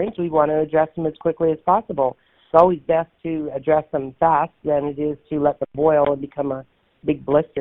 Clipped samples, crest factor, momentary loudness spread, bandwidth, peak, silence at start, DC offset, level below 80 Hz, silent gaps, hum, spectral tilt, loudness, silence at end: under 0.1%; 20 dB; 9 LU; 4 kHz; 0 dBFS; 0 s; under 0.1%; -52 dBFS; none; none; -7 dB/octave; -20 LUFS; 0 s